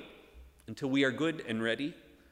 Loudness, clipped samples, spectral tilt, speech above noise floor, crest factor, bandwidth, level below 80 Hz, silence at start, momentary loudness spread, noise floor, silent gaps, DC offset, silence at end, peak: -32 LUFS; under 0.1%; -5.5 dB/octave; 24 dB; 20 dB; 12.5 kHz; -62 dBFS; 0 s; 20 LU; -56 dBFS; none; under 0.1%; 0.3 s; -14 dBFS